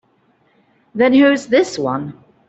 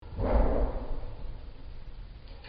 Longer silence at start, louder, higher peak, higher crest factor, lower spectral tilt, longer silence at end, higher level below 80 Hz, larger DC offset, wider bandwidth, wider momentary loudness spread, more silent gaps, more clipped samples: first, 0.95 s vs 0 s; first, -15 LUFS vs -32 LUFS; first, -4 dBFS vs -14 dBFS; about the same, 14 dB vs 18 dB; second, -5 dB/octave vs -7.5 dB/octave; first, 0.35 s vs 0 s; second, -60 dBFS vs -32 dBFS; neither; first, 8.2 kHz vs 5.2 kHz; second, 17 LU vs 20 LU; neither; neither